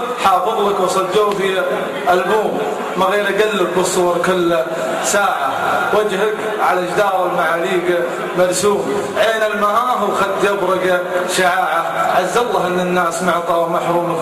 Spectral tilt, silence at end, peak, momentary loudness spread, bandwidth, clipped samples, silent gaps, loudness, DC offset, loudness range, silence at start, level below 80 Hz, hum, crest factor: -4 dB/octave; 0 s; -2 dBFS; 3 LU; 15 kHz; under 0.1%; none; -16 LUFS; under 0.1%; 1 LU; 0 s; -54 dBFS; none; 12 dB